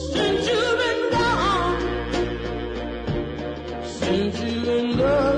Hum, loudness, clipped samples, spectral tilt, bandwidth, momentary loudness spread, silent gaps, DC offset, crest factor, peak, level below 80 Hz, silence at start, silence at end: none; -23 LUFS; under 0.1%; -5.5 dB/octave; 10.5 kHz; 10 LU; none; under 0.1%; 14 dB; -10 dBFS; -38 dBFS; 0 s; 0 s